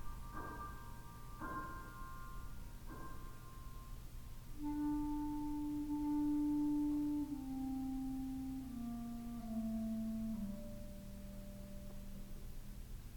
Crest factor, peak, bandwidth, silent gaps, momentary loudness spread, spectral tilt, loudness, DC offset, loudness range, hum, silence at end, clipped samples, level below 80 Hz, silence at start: 12 dB; -30 dBFS; 19 kHz; none; 17 LU; -6.5 dB/octave; -44 LUFS; under 0.1%; 12 LU; none; 0 s; under 0.1%; -52 dBFS; 0 s